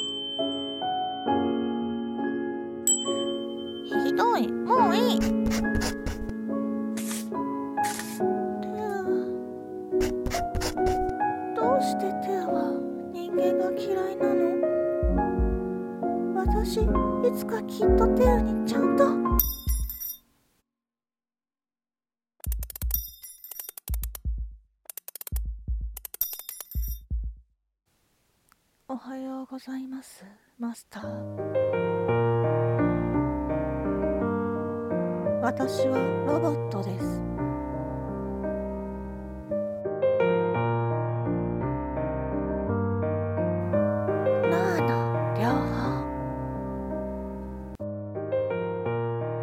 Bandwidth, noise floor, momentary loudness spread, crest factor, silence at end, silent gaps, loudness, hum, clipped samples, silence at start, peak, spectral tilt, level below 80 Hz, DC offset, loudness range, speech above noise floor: 16.5 kHz; under -90 dBFS; 12 LU; 24 dB; 0 s; none; -28 LUFS; none; under 0.1%; 0 s; -4 dBFS; -5.5 dB/octave; -38 dBFS; under 0.1%; 11 LU; over 65 dB